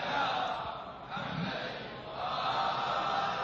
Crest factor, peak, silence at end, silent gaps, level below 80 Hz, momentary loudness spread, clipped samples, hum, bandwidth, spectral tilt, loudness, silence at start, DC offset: 14 dB; -20 dBFS; 0 s; none; -62 dBFS; 10 LU; under 0.1%; none; 7.6 kHz; -4.5 dB/octave; -34 LUFS; 0 s; under 0.1%